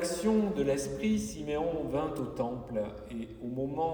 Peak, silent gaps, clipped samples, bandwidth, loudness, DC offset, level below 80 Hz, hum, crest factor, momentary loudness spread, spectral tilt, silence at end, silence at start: -18 dBFS; none; under 0.1%; over 20 kHz; -33 LUFS; under 0.1%; -52 dBFS; none; 14 dB; 10 LU; -6 dB/octave; 0 s; 0 s